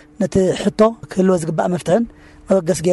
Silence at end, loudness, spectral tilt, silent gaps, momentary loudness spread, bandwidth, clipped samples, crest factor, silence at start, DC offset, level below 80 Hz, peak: 0 s; -18 LUFS; -6.5 dB/octave; none; 4 LU; 12 kHz; under 0.1%; 14 dB; 0.2 s; under 0.1%; -44 dBFS; -2 dBFS